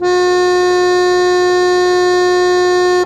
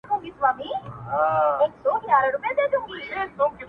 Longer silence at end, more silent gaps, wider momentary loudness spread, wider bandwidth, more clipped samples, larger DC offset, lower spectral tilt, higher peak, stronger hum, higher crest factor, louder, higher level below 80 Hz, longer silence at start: about the same, 0 s vs 0 s; neither; second, 0 LU vs 10 LU; first, 10.5 kHz vs 5.2 kHz; neither; neither; second, -3.5 dB/octave vs -7 dB/octave; first, -2 dBFS vs -6 dBFS; neither; second, 10 dB vs 18 dB; first, -12 LUFS vs -24 LUFS; first, -46 dBFS vs -58 dBFS; about the same, 0 s vs 0.05 s